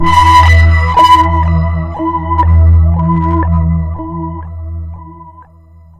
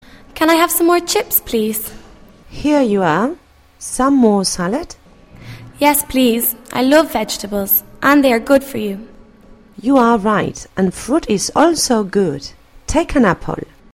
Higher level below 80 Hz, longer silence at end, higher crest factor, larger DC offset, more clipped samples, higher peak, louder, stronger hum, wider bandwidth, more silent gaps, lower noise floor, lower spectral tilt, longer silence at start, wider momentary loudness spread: first, -16 dBFS vs -38 dBFS; first, 0.6 s vs 0.35 s; second, 10 dB vs 16 dB; neither; first, 0.5% vs under 0.1%; about the same, 0 dBFS vs 0 dBFS; first, -10 LUFS vs -15 LUFS; neither; second, 9.6 kHz vs 16.5 kHz; neither; second, -39 dBFS vs -43 dBFS; first, -6.5 dB/octave vs -4 dB/octave; second, 0 s vs 0.35 s; first, 18 LU vs 14 LU